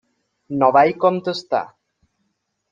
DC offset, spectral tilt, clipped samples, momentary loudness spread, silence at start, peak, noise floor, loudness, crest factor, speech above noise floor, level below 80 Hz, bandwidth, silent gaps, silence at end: under 0.1%; -6.5 dB/octave; under 0.1%; 13 LU; 0.5 s; -2 dBFS; -72 dBFS; -18 LUFS; 18 dB; 55 dB; -64 dBFS; 7.6 kHz; none; 1.05 s